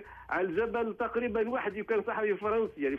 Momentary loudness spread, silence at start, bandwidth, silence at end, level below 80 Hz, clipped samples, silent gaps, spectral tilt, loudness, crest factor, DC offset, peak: 3 LU; 0 s; 5.4 kHz; 0 s; -60 dBFS; under 0.1%; none; -7.5 dB/octave; -32 LUFS; 12 dB; under 0.1%; -18 dBFS